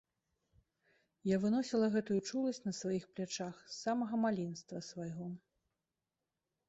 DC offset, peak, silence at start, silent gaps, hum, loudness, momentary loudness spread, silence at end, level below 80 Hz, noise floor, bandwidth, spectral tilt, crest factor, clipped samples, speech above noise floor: under 0.1%; -22 dBFS; 1.25 s; none; none; -38 LUFS; 12 LU; 1.3 s; -78 dBFS; under -90 dBFS; 8.2 kHz; -5.5 dB/octave; 16 dB; under 0.1%; over 53 dB